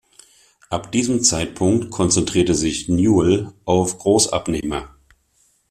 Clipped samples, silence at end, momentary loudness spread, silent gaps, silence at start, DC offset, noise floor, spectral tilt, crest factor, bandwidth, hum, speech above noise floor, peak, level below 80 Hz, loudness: under 0.1%; 0.85 s; 8 LU; none; 0.7 s; under 0.1%; -61 dBFS; -4.5 dB/octave; 16 dB; 15 kHz; none; 43 dB; -2 dBFS; -44 dBFS; -18 LUFS